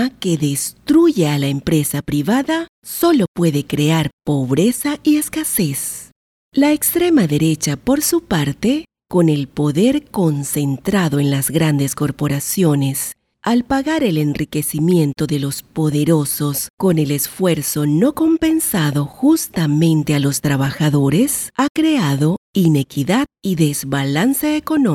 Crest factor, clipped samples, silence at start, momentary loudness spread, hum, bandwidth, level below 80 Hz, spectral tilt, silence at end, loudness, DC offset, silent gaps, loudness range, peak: 16 dB; under 0.1%; 0 s; 5 LU; none; 17.5 kHz; -46 dBFS; -5.5 dB/octave; 0 s; -17 LUFS; under 0.1%; 2.69-2.82 s, 3.28-3.35 s, 4.13-4.18 s, 6.12-6.52 s, 16.70-16.77 s, 21.70-21.75 s, 22.38-22.53 s; 2 LU; -2 dBFS